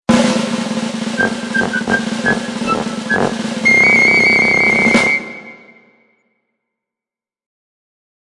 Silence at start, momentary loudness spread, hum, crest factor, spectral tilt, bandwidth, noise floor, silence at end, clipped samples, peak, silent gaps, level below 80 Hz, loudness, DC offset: 0.1 s; 11 LU; none; 16 dB; -4 dB/octave; 11.5 kHz; -89 dBFS; 2.7 s; under 0.1%; 0 dBFS; none; -48 dBFS; -13 LUFS; under 0.1%